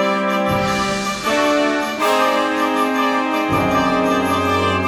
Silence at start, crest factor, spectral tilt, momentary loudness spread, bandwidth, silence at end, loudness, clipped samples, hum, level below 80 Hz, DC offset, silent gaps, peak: 0 s; 12 dB; -4.5 dB/octave; 3 LU; 17.5 kHz; 0 s; -17 LUFS; under 0.1%; none; -46 dBFS; under 0.1%; none; -4 dBFS